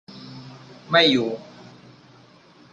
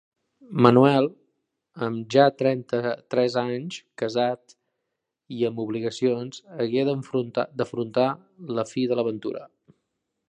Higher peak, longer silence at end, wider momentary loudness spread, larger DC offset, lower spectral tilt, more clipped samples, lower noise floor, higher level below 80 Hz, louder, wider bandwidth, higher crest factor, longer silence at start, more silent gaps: second, -4 dBFS vs 0 dBFS; first, 1.3 s vs 0.85 s; first, 25 LU vs 14 LU; neither; second, -4.5 dB/octave vs -7 dB/octave; neither; second, -51 dBFS vs -82 dBFS; about the same, -66 dBFS vs -68 dBFS; first, -19 LUFS vs -24 LUFS; second, 8.8 kHz vs 9.8 kHz; about the same, 22 dB vs 24 dB; second, 0.1 s vs 0.5 s; neither